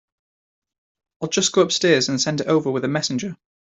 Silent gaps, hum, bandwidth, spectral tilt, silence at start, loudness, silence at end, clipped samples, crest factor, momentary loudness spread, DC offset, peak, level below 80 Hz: none; none; 8.2 kHz; -3.5 dB/octave; 1.2 s; -20 LUFS; 0.25 s; under 0.1%; 18 dB; 10 LU; under 0.1%; -4 dBFS; -64 dBFS